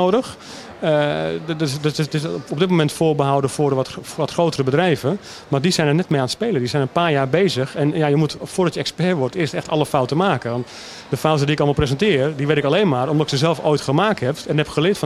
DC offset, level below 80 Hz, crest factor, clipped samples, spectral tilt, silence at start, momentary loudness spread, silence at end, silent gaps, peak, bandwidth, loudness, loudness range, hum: under 0.1%; -48 dBFS; 18 dB; under 0.1%; -6 dB/octave; 0 s; 7 LU; 0 s; none; 0 dBFS; 13.5 kHz; -19 LUFS; 2 LU; none